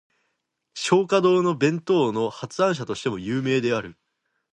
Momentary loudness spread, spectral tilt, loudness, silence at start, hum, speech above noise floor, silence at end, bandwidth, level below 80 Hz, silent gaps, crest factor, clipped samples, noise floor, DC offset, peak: 9 LU; -5.5 dB/octave; -23 LUFS; 0.75 s; none; 54 dB; 0.6 s; 10.5 kHz; -64 dBFS; none; 20 dB; under 0.1%; -76 dBFS; under 0.1%; -4 dBFS